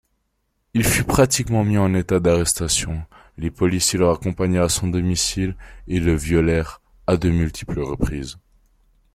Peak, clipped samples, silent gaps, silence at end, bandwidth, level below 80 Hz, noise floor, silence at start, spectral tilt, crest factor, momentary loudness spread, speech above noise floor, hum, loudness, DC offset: -4 dBFS; under 0.1%; none; 0.75 s; 16 kHz; -36 dBFS; -71 dBFS; 0.75 s; -4.5 dB/octave; 16 dB; 12 LU; 51 dB; none; -20 LUFS; under 0.1%